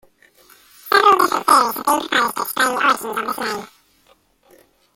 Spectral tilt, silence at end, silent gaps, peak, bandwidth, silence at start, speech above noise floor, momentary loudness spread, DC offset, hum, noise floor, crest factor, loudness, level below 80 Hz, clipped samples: -1.5 dB/octave; 1.3 s; none; 0 dBFS; 17 kHz; 0.85 s; 37 dB; 11 LU; under 0.1%; none; -57 dBFS; 20 dB; -17 LUFS; -62 dBFS; under 0.1%